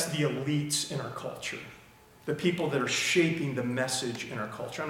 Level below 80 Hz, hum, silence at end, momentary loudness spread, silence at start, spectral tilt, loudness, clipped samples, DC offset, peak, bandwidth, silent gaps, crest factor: -68 dBFS; none; 0 s; 12 LU; 0 s; -4 dB/octave; -30 LUFS; under 0.1%; under 0.1%; -12 dBFS; 17 kHz; none; 18 dB